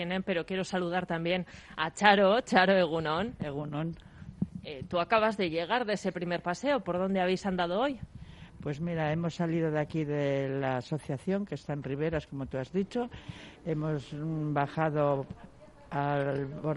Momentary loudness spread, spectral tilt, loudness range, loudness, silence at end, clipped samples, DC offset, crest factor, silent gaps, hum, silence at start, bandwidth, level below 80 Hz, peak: 14 LU; -6 dB/octave; 7 LU; -31 LUFS; 0 s; under 0.1%; under 0.1%; 24 dB; none; none; 0 s; 11 kHz; -58 dBFS; -8 dBFS